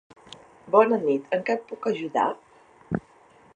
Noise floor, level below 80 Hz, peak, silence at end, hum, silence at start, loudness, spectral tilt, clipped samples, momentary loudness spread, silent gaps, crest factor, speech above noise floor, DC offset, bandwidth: -55 dBFS; -62 dBFS; -4 dBFS; 0.55 s; none; 0.65 s; -25 LUFS; -7 dB/octave; under 0.1%; 13 LU; none; 22 dB; 32 dB; under 0.1%; 8.8 kHz